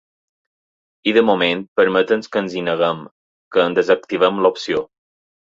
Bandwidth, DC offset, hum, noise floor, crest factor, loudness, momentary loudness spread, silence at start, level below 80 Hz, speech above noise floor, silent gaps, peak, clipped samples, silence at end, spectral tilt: 7.6 kHz; under 0.1%; none; under -90 dBFS; 18 dB; -18 LUFS; 8 LU; 1.05 s; -62 dBFS; over 73 dB; 1.68-1.76 s, 3.11-3.51 s; -2 dBFS; under 0.1%; 0.7 s; -5.5 dB/octave